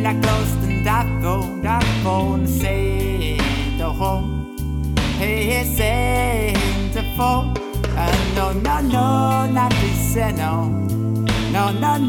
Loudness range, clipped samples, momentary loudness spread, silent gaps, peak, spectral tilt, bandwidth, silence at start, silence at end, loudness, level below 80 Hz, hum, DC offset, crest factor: 2 LU; under 0.1%; 4 LU; none; -4 dBFS; -5.5 dB/octave; 19 kHz; 0 s; 0 s; -20 LUFS; -26 dBFS; none; under 0.1%; 14 dB